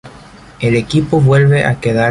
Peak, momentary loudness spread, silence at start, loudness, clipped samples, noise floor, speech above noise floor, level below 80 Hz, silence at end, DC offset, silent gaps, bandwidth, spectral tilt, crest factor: 0 dBFS; 6 LU; 0.05 s; -12 LUFS; under 0.1%; -37 dBFS; 26 dB; -40 dBFS; 0 s; under 0.1%; none; 11.5 kHz; -7.5 dB/octave; 12 dB